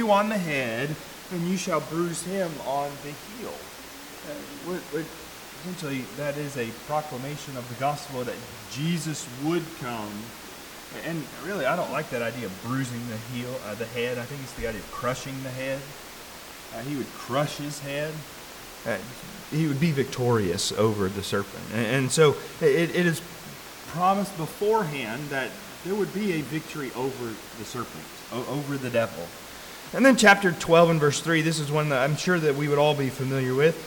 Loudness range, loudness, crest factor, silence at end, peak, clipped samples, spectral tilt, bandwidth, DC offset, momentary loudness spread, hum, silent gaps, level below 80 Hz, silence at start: 11 LU; -27 LUFS; 22 dB; 0 s; -6 dBFS; under 0.1%; -5 dB/octave; 19 kHz; under 0.1%; 16 LU; none; none; -56 dBFS; 0 s